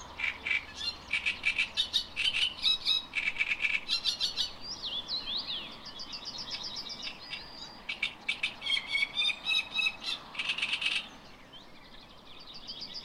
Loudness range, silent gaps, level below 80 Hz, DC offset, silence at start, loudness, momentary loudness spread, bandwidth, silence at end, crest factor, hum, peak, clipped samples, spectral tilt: 8 LU; none; -58 dBFS; under 0.1%; 0 s; -31 LUFS; 17 LU; 16 kHz; 0 s; 20 dB; none; -14 dBFS; under 0.1%; 0 dB/octave